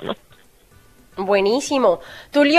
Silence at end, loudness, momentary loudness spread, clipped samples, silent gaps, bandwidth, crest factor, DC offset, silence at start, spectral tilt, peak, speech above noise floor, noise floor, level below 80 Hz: 0 s; -20 LUFS; 15 LU; under 0.1%; none; 14 kHz; 20 dB; under 0.1%; 0 s; -4 dB/octave; 0 dBFS; 34 dB; -51 dBFS; -56 dBFS